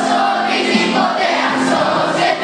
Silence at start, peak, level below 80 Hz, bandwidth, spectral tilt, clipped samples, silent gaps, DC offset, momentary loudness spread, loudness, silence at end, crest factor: 0 s; -2 dBFS; -60 dBFS; 10 kHz; -4 dB/octave; under 0.1%; none; under 0.1%; 1 LU; -15 LUFS; 0 s; 12 dB